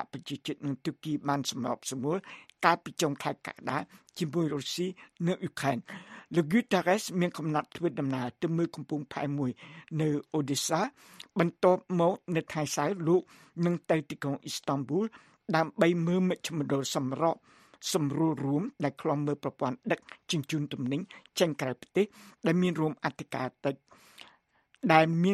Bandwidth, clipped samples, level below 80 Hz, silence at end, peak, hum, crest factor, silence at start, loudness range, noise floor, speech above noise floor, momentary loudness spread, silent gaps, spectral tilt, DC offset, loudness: 14.5 kHz; under 0.1%; -72 dBFS; 0 s; -6 dBFS; none; 24 dB; 0 s; 3 LU; -67 dBFS; 37 dB; 10 LU; none; -5.5 dB/octave; under 0.1%; -31 LUFS